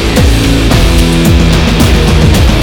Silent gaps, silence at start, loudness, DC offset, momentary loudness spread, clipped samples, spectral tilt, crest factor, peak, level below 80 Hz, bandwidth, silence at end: none; 0 s; -7 LUFS; under 0.1%; 1 LU; 2%; -5.5 dB/octave; 6 dB; 0 dBFS; -10 dBFS; 20 kHz; 0 s